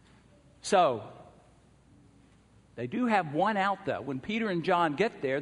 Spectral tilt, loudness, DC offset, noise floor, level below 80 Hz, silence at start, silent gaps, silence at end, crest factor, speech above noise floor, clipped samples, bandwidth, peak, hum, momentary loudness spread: -5 dB/octave; -29 LUFS; under 0.1%; -60 dBFS; -66 dBFS; 0.65 s; none; 0 s; 20 dB; 32 dB; under 0.1%; 10.5 kHz; -12 dBFS; none; 14 LU